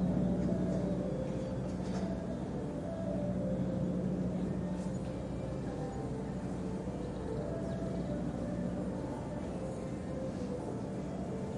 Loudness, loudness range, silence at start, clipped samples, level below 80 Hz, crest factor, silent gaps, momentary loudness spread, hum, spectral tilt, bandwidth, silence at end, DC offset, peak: -37 LUFS; 2 LU; 0 s; under 0.1%; -50 dBFS; 14 dB; none; 6 LU; none; -8.5 dB/octave; 11 kHz; 0 s; under 0.1%; -22 dBFS